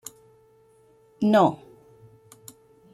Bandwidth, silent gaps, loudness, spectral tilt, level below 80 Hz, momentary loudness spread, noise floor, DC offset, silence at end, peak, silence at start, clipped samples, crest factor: 14 kHz; none; -21 LUFS; -6.5 dB/octave; -68 dBFS; 28 LU; -58 dBFS; under 0.1%; 1.4 s; -6 dBFS; 1.2 s; under 0.1%; 22 dB